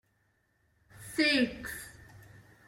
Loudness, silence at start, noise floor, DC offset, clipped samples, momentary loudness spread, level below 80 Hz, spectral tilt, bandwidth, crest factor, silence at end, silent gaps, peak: -30 LUFS; 0.95 s; -73 dBFS; under 0.1%; under 0.1%; 22 LU; -62 dBFS; -3 dB/octave; 16.5 kHz; 20 dB; 0.3 s; none; -16 dBFS